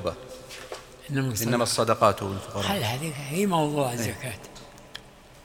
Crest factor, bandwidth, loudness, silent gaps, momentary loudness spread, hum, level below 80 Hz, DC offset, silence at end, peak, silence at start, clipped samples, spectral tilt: 22 dB; over 20 kHz; -26 LUFS; none; 20 LU; none; -56 dBFS; under 0.1%; 0 s; -4 dBFS; 0 s; under 0.1%; -4.5 dB/octave